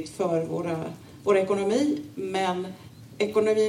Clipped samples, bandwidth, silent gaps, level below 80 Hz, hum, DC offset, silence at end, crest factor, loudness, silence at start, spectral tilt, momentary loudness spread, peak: under 0.1%; 15 kHz; none; -66 dBFS; none; under 0.1%; 0 s; 18 dB; -26 LUFS; 0 s; -5.5 dB/octave; 14 LU; -8 dBFS